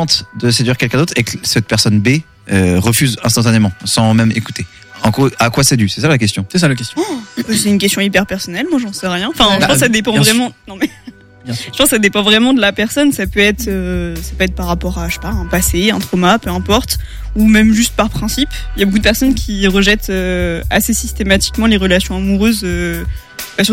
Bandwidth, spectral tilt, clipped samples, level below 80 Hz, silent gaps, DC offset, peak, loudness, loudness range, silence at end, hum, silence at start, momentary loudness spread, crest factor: 17 kHz; -4 dB/octave; under 0.1%; -26 dBFS; none; under 0.1%; 0 dBFS; -13 LUFS; 2 LU; 0 s; none; 0 s; 10 LU; 14 dB